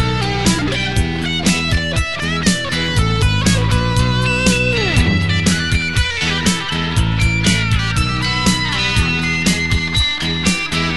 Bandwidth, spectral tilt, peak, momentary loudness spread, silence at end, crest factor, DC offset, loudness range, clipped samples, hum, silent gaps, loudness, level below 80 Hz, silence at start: 12 kHz; -4 dB/octave; 0 dBFS; 3 LU; 0 s; 14 dB; 2%; 1 LU; under 0.1%; none; none; -16 LUFS; -24 dBFS; 0 s